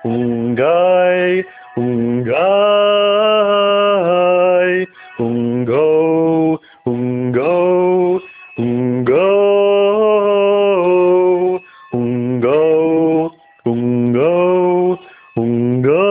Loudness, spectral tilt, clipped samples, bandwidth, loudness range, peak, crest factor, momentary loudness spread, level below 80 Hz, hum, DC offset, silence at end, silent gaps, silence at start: -14 LUFS; -10.5 dB/octave; under 0.1%; 4 kHz; 3 LU; -2 dBFS; 12 dB; 9 LU; -56 dBFS; none; under 0.1%; 0 s; none; 0 s